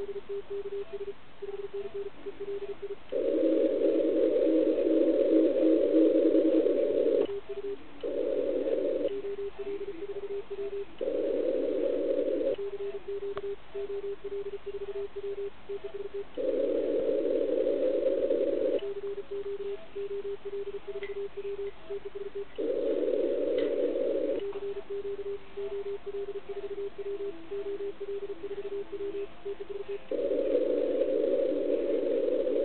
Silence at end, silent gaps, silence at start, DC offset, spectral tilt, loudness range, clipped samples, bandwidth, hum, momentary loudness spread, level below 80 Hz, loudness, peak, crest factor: 0 s; none; 0 s; 0.9%; -9.5 dB/octave; 12 LU; under 0.1%; 4.4 kHz; none; 13 LU; -62 dBFS; -31 LUFS; -12 dBFS; 18 dB